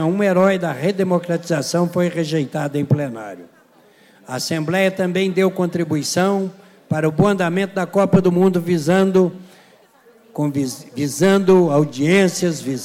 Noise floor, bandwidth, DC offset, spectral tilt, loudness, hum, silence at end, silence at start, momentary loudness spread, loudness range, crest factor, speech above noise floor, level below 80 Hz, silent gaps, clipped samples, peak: -51 dBFS; 16 kHz; under 0.1%; -6 dB/octave; -18 LUFS; none; 0 s; 0 s; 9 LU; 4 LU; 14 dB; 34 dB; -54 dBFS; none; under 0.1%; -4 dBFS